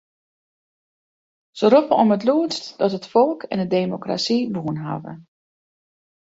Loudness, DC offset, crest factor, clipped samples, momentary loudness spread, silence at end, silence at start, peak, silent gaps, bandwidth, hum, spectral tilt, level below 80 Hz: -20 LUFS; under 0.1%; 20 dB; under 0.1%; 11 LU; 1.1 s; 1.55 s; -2 dBFS; none; 8 kHz; none; -6 dB/octave; -64 dBFS